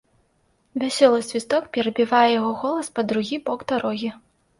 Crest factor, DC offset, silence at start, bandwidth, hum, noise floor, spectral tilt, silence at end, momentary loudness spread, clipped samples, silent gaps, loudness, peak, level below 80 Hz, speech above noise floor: 18 dB; under 0.1%; 0.75 s; 11.5 kHz; none; -65 dBFS; -4 dB/octave; 0.45 s; 10 LU; under 0.1%; none; -22 LUFS; -4 dBFS; -64 dBFS; 44 dB